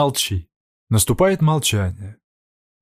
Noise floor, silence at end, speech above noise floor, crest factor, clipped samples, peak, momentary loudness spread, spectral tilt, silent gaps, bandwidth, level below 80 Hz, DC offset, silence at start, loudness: under -90 dBFS; 0.7 s; over 72 dB; 16 dB; under 0.1%; -4 dBFS; 14 LU; -4.5 dB/octave; 0.56-0.87 s; 15.5 kHz; -42 dBFS; under 0.1%; 0 s; -19 LUFS